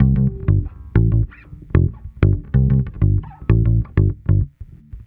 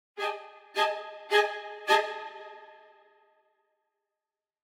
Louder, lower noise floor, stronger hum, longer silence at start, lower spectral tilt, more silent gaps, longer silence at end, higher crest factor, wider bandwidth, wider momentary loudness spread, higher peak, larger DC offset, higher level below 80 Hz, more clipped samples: first, -19 LUFS vs -29 LUFS; second, -37 dBFS vs under -90 dBFS; neither; second, 0 s vs 0.15 s; first, -12.5 dB/octave vs 0 dB/octave; neither; second, 0.1 s vs 1.9 s; second, 18 dB vs 24 dB; second, 3.5 kHz vs 17.5 kHz; second, 5 LU vs 19 LU; first, 0 dBFS vs -10 dBFS; neither; first, -24 dBFS vs under -90 dBFS; neither